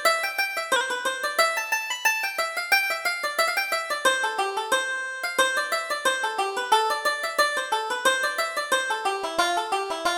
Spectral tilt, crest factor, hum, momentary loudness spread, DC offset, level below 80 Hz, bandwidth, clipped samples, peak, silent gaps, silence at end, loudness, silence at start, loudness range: 1 dB/octave; 18 dB; none; 4 LU; under 0.1%; -66 dBFS; over 20 kHz; under 0.1%; -6 dBFS; none; 0 s; -24 LUFS; 0 s; 1 LU